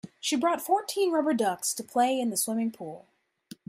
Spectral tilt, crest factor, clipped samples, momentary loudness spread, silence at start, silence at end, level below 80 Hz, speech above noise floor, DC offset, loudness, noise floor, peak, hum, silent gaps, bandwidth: -3 dB/octave; 16 dB; under 0.1%; 9 LU; 0.05 s; 0.7 s; -78 dBFS; 24 dB; under 0.1%; -27 LUFS; -52 dBFS; -12 dBFS; none; none; 16 kHz